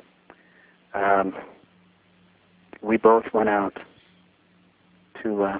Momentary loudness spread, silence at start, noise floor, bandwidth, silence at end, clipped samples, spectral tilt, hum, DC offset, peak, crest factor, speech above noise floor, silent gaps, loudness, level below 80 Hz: 17 LU; 0.95 s; -60 dBFS; 4 kHz; 0 s; under 0.1%; -10 dB/octave; none; under 0.1%; -4 dBFS; 22 dB; 38 dB; none; -23 LUFS; -62 dBFS